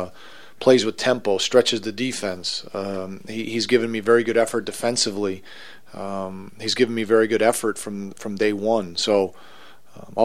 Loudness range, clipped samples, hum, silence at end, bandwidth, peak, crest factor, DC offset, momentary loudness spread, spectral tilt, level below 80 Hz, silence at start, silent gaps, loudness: 1 LU; under 0.1%; none; 0 s; 15.5 kHz; -2 dBFS; 22 dB; 0.9%; 14 LU; -3.5 dB/octave; -62 dBFS; 0 s; none; -22 LUFS